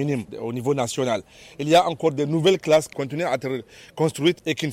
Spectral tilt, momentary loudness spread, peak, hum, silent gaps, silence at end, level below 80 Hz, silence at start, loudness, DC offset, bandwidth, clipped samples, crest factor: -5 dB/octave; 11 LU; -6 dBFS; none; none; 0 s; -60 dBFS; 0 s; -23 LUFS; under 0.1%; 16.5 kHz; under 0.1%; 16 dB